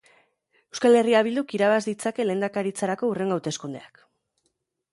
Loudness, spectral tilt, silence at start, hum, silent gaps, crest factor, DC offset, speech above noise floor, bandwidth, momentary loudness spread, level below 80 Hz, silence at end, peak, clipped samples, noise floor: -24 LUFS; -5 dB/octave; 0.75 s; none; none; 18 dB; under 0.1%; 52 dB; 11.5 kHz; 14 LU; -72 dBFS; 1.05 s; -6 dBFS; under 0.1%; -75 dBFS